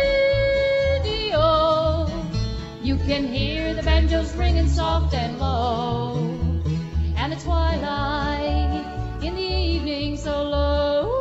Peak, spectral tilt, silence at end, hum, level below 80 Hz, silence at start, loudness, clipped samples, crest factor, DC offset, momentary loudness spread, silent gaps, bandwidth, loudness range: -6 dBFS; -6.5 dB/octave; 0 s; none; -26 dBFS; 0 s; -23 LUFS; under 0.1%; 14 dB; under 0.1%; 7 LU; none; 8 kHz; 3 LU